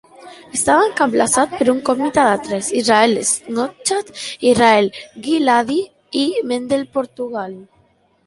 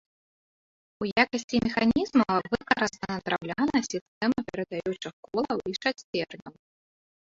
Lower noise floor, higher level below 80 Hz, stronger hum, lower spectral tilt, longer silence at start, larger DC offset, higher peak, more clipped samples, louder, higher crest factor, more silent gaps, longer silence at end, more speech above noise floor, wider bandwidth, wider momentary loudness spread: second, -57 dBFS vs under -90 dBFS; about the same, -54 dBFS vs -58 dBFS; neither; second, -3 dB/octave vs -4.5 dB/octave; second, 0.2 s vs 1 s; neither; first, -2 dBFS vs -6 dBFS; neither; first, -17 LUFS vs -28 LUFS; second, 16 dB vs 22 dB; second, none vs 1.44-1.48 s, 4.01-4.21 s, 5.13-5.23 s, 6.04-6.13 s; second, 0.65 s vs 0.85 s; second, 41 dB vs over 62 dB; first, 11.5 kHz vs 7.8 kHz; about the same, 11 LU vs 10 LU